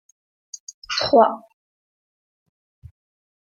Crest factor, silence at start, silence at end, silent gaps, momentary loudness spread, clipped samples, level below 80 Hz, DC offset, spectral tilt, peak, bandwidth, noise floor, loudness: 24 dB; 0.55 s; 2.1 s; 0.60-0.67 s, 0.74-0.82 s; 22 LU; under 0.1%; -60 dBFS; under 0.1%; -3.5 dB/octave; -2 dBFS; 7.6 kHz; under -90 dBFS; -18 LUFS